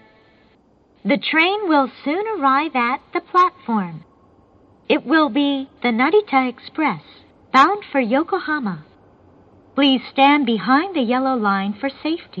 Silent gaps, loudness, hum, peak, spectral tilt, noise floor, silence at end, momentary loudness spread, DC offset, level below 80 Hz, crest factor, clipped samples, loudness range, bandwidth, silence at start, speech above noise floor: none; -18 LUFS; none; 0 dBFS; -6 dB/octave; -55 dBFS; 0 s; 10 LU; under 0.1%; -64 dBFS; 18 dB; under 0.1%; 2 LU; 7.4 kHz; 1.05 s; 37 dB